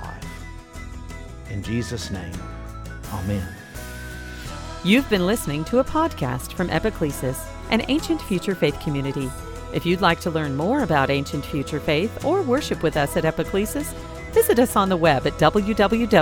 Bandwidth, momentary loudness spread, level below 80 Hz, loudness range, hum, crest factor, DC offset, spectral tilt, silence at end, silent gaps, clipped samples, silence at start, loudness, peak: 18.5 kHz; 17 LU; -38 dBFS; 10 LU; none; 22 dB; under 0.1%; -5.5 dB/octave; 0 s; none; under 0.1%; 0 s; -22 LUFS; 0 dBFS